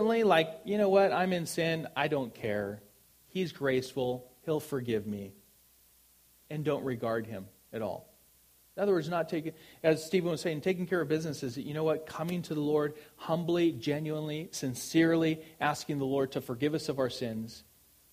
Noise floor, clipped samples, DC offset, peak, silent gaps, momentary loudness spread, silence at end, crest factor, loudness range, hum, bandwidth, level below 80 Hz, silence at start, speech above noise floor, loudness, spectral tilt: -64 dBFS; under 0.1%; under 0.1%; -12 dBFS; none; 13 LU; 0.5 s; 20 dB; 6 LU; none; 15.5 kHz; -68 dBFS; 0 s; 32 dB; -32 LUFS; -5.5 dB/octave